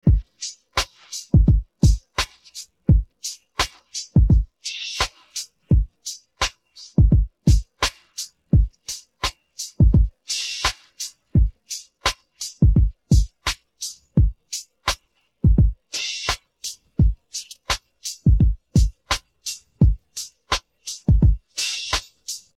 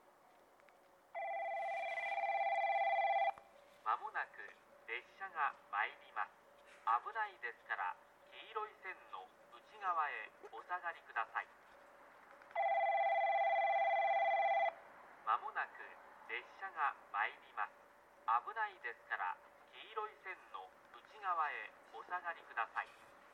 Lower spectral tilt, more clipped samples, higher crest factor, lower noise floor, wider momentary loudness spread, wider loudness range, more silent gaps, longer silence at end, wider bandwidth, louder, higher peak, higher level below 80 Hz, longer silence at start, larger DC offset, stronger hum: first, -4.5 dB/octave vs -2 dB/octave; neither; about the same, 16 dB vs 18 dB; second, -55 dBFS vs -67 dBFS; second, 15 LU vs 20 LU; second, 2 LU vs 8 LU; neither; first, 0.2 s vs 0.05 s; first, 14 kHz vs 10.5 kHz; first, -22 LUFS vs -40 LUFS; first, -6 dBFS vs -22 dBFS; first, -24 dBFS vs -90 dBFS; second, 0.05 s vs 1.15 s; neither; neither